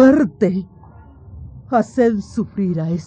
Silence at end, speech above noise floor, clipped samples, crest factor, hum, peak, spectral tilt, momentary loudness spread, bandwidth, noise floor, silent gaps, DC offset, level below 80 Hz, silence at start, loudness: 0 s; 24 dB; under 0.1%; 16 dB; none; -2 dBFS; -8.5 dB/octave; 22 LU; 8.8 kHz; -42 dBFS; none; under 0.1%; -46 dBFS; 0 s; -18 LUFS